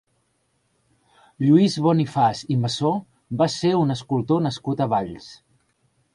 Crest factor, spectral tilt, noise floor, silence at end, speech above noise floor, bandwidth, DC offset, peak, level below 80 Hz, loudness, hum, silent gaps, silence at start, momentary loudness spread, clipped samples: 18 dB; -7 dB/octave; -69 dBFS; 0.8 s; 48 dB; 11.5 kHz; under 0.1%; -4 dBFS; -58 dBFS; -21 LUFS; none; none; 1.4 s; 8 LU; under 0.1%